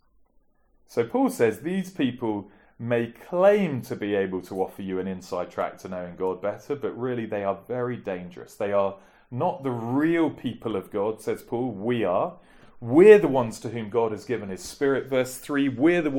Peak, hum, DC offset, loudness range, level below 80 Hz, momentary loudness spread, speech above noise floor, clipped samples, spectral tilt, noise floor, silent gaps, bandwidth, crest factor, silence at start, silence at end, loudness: -2 dBFS; none; under 0.1%; 8 LU; -60 dBFS; 11 LU; 38 dB; under 0.1%; -6.5 dB/octave; -62 dBFS; none; 17.5 kHz; 22 dB; 0.9 s; 0 s; -25 LUFS